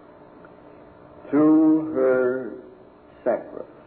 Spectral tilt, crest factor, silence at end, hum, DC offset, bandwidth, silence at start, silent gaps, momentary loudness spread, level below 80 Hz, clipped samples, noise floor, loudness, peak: -12 dB/octave; 14 dB; 0.2 s; none; under 0.1%; 2.9 kHz; 1.25 s; none; 19 LU; -64 dBFS; under 0.1%; -49 dBFS; -21 LUFS; -10 dBFS